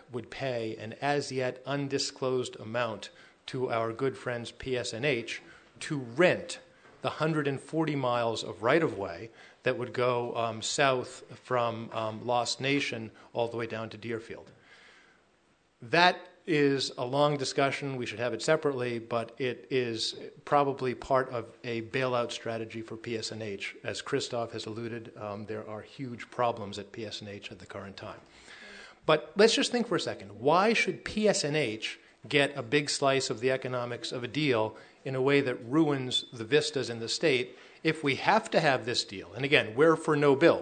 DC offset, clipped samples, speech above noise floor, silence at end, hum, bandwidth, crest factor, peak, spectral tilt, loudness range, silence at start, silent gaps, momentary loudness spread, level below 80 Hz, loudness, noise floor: under 0.1%; under 0.1%; 38 dB; 0 s; none; 9.4 kHz; 24 dB; -6 dBFS; -4.5 dB/octave; 8 LU; 0.1 s; none; 14 LU; -68 dBFS; -30 LUFS; -68 dBFS